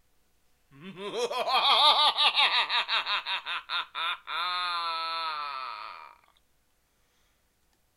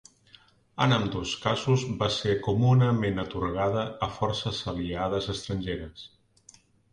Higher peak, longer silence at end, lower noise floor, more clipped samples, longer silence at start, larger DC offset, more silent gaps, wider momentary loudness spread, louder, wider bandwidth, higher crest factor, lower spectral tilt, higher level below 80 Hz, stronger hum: about the same, -8 dBFS vs -10 dBFS; first, 1.9 s vs 0.85 s; first, -70 dBFS vs -58 dBFS; neither; about the same, 0.8 s vs 0.75 s; neither; neither; first, 17 LU vs 10 LU; about the same, -26 LUFS vs -27 LUFS; first, 15.5 kHz vs 10 kHz; about the same, 22 dB vs 18 dB; second, -0.5 dB/octave vs -6 dB/octave; second, -74 dBFS vs -48 dBFS; neither